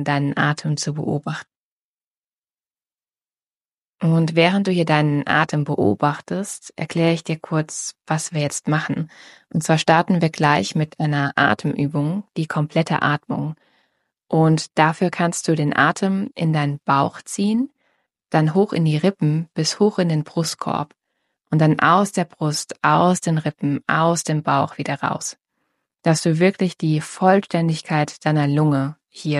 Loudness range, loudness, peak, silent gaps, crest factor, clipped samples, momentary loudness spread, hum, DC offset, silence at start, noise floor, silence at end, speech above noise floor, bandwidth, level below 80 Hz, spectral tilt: 4 LU; -20 LUFS; -2 dBFS; 1.56-2.22 s, 2.33-2.42 s, 3.47-3.51 s, 3.74-3.85 s; 18 dB; under 0.1%; 9 LU; none; under 0.1%; 0 s; under -90 dBFS; 0 s; over 71 dB; 13.5 kHz; -64 dBFS; -5.5 dB/octave